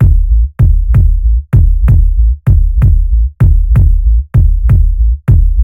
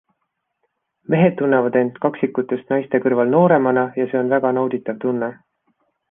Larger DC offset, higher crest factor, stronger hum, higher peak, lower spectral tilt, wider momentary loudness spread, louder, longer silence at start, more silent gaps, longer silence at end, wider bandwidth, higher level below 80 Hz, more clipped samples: neither; second, 6 dB vs 16 dB; neither; about the same, 0 dBFS vs -2 dBFS; about the same, -10.5 dB/octave vs -11 dB/octave; second, 3 LU vs 8 LU; first, -11 LUFS vs -18 LUFS; second, 0 s vs 1.1 s; neither; second, 0 s vs 0.75 s; second, 2.6 kHz vs 3.7 kHz; first, -8 dBFS vs -64 dBFS; first, 0.4% vs under 0.1%